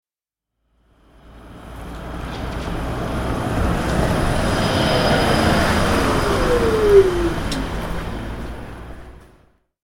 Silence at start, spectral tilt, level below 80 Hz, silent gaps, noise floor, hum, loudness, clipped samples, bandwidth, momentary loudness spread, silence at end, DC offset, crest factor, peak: 1.25 s; -5.5 dB/octave; -28 dBFS; none; -88 dBFS; none; -19 LUFS; under 0.1%; 16.5 kHz; 19 LU; 0.7 s; under 0.1%; 18 dB; -2 dBFS